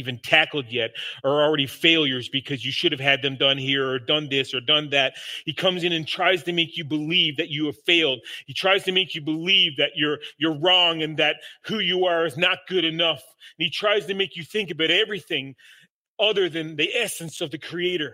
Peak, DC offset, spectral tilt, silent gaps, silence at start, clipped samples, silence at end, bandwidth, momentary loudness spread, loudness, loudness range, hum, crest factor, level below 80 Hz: -2 dBFS; under 0.1%; -4 dB/octave; 15.90-16.17 s; 0 s; under 0.1%; 0 s; 16 kHz; 10 LU; -22 LUFS; 3 LU; none; 22 dB; -72 dBFS